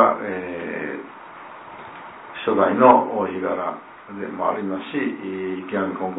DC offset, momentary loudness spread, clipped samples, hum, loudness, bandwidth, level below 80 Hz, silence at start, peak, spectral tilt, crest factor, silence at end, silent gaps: under 0.1%; 23 LU; under 0.1%; none; -22 LUFS; 4 kHz; -66 dBFS; 0 s; 0 dBFS; -10 dB/octave; 22 dB; 0 s; none